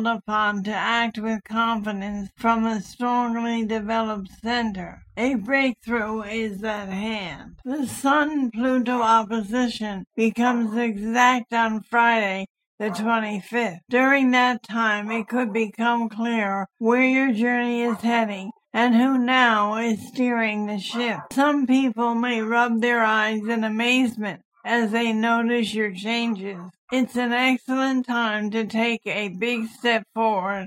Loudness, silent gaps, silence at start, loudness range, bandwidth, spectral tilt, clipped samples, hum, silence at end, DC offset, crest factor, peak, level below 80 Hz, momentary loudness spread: -22 LUFS; 12.50-12.55 s, 12.67-12.78 s, 24.45-24.52 s, 26.78-26.88 s; 0 s; 4 LU; 15.5 kHz; -4.5 dB/octave; under 0.1%; none; 0 s; under 0.1%; 18 dB; -4 dBFS; -60 dBFS; 10 LU